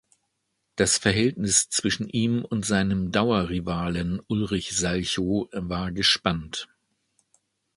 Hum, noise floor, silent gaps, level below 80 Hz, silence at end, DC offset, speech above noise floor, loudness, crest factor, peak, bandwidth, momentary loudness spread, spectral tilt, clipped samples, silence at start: none; -77 dBFS; none; -46 dBFS; 1.1 s; under 0.1%; 52 dB; -24 LUFS; 22 dB; -4 dBFS; 11.5 kHz; 9 LU; -3.5 dB/octave; under 0.1%; 0.75 s